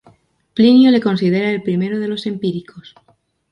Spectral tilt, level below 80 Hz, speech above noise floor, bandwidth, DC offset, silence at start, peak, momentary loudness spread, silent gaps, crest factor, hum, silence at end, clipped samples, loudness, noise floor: -8 dB/octave; -60 dBFS; 44 dB; 6 kHz; under 0.1%; 0.55 s; -2 dBFS; 13 LU; none; 14 dB; none; 0.7 s; under 0.1%; -15 LUFS; -59 dBFS